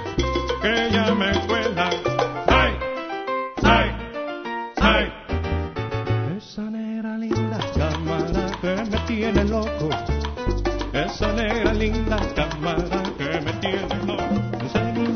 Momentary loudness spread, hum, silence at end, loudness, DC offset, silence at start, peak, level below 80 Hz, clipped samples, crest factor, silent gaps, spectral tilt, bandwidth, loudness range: 9 LU; none; 0 s; -23 LUFS; under 0.1%; 0 s; -2 dBFS; -32 dBFS; under 0.1%; 20 dB; none; -6 dB/octave; 6.6 kHz; 4 LU